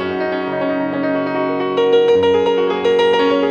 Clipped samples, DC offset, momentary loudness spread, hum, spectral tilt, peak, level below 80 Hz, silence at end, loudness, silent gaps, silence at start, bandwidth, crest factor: under 0.1%; under 0.1%; 7 LU; none; -6 dB/octave; -4 dBFS; -56 dBFS; 0 s; -16 LUFS; none; 0 s; 7 kHz; 12 dB